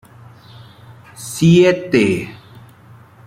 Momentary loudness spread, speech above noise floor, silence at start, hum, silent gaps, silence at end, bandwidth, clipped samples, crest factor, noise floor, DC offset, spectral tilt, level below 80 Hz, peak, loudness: 21 LU; 30 dB; 1.2 s; none; none; 0.9 s; 15 kHz; under 0.1%; 16 dB; -44 dBFS; under 0.1%; -6 dB/octave; -52 dBFS; -2 dBFS; -14 LUFS